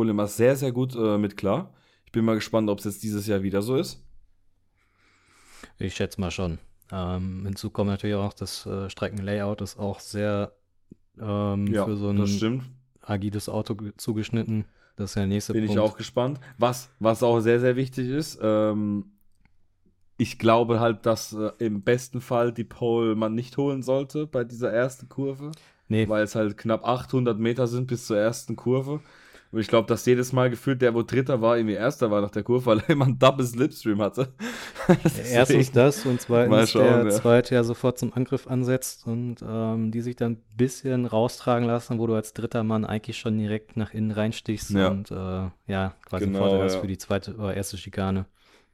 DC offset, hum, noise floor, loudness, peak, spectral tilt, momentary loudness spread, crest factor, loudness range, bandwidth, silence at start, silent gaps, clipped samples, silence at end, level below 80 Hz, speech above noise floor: under 0.1%; none; -65 dBFS; -25 LUFS; -2 dBFS; -6.5 dB/octave; 11 LU; 22 dB; 8 LU; 16.5 kHz; 0 s; none; under 0.1%; 0.5 s; -54 dBFS; 41 dB